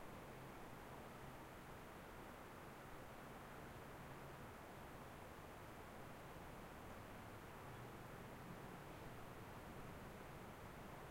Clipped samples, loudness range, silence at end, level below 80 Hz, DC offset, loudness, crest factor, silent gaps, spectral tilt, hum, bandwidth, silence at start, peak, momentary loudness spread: under 0.1%; 1 LU; 0 s; -66 dBFS; under 0.1%; -57 LUFS; 14 dB; none; -5 dB/octave; none; 16 kHz; 0 s; -42 dBFS; 1 LU